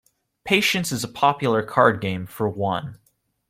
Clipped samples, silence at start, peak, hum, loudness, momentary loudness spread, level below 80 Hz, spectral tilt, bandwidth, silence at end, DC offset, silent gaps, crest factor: under 0.1%; 0.45 s; -2 dBFS; none; -21 LUFS; 10 LU; -58 dBFS; -4.5 dB/octave; 16.5 kHz; 0.55 s; under 0.1%; none; 22 dB